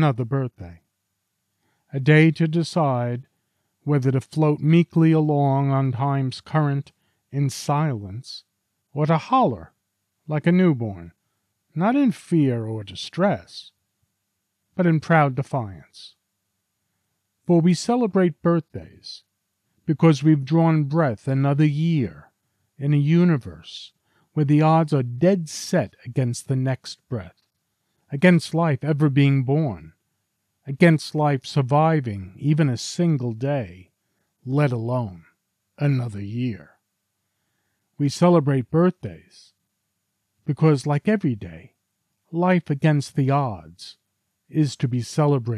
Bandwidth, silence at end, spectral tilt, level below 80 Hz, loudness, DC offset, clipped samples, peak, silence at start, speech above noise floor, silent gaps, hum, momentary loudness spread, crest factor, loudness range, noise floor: 11.5 kHz; 0 s; -7.5 dB/octave; -62 dBFS; -21 LUFS; under 0.1%; under 0.1%; -4 dBFS; 0 s; 56 dB; none; none; 17 LU; 18 dB; 4 LU; -77 dBFS